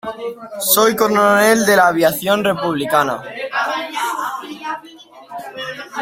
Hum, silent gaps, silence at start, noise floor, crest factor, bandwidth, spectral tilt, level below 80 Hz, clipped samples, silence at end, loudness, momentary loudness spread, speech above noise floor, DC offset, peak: none; none; 0.05 s; -41 dBFS; 18 dB; 16.5 kHz; -3 dB/octave; -58 dBFS; under 0.1%; 0 s; -15 LUFS; 16 LU; 26 dB; under 0.1%; 0 dBFS